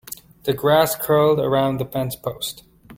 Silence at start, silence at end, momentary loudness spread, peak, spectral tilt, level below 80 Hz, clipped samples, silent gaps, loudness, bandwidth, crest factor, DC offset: 0.1 s; 0 s; 12 LU; -2 dBFS; -5 dB/octave; -52 dBFS; under 0.1%; none; -20 LUFS; 17 kHz; 18 dB; under 0.1%